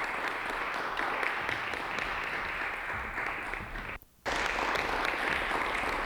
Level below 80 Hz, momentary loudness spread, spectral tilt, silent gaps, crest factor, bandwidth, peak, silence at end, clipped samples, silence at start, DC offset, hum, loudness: -50 dBFS; 7 LU; -3 dB/octave; none; 20 dB; over 20 kHz; -14 dBFS; 0 s; under 0.1%; 0 s; under 0.1%; none; -32 LUFS